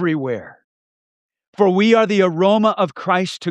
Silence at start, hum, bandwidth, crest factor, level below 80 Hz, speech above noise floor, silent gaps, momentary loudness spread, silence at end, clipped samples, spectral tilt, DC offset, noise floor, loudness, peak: 0 s; none; 11 kHz; 16 dB; -70 dBFS; over 74 dB; 0.64-1.29 s, 1.48-1.53 s; 9 LU; 0 s; under 0.1%; -6 dB/octave; under 0.1%; under -90 dBFS; -16 LUFS; -2 dBFS